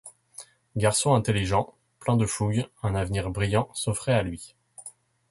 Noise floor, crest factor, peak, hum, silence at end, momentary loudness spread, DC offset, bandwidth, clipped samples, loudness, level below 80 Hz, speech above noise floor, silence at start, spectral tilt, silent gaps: -49 dBFS; 20 dB; -8 dBFS; none; 0.4 s; 22 LU; under 0.1%; 11.5 kHz; under 0.1%; -26 LUFS; -46 dBFS; 24 dB; 0.05 s; -5 dB/octave; none